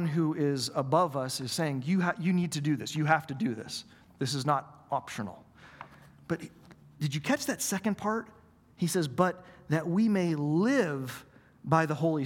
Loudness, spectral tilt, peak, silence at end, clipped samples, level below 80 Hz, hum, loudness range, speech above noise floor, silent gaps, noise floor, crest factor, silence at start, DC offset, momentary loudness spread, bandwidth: -30 LUFS; -5.5 dB/octave; -8 dBFS; 0 s; under 0.1%; -68 dBFS; none; 6 LU; 22 dB; none; -51 dBFS; 22 dB; 0 s; under 0.1%; 13 LU; 18 kHz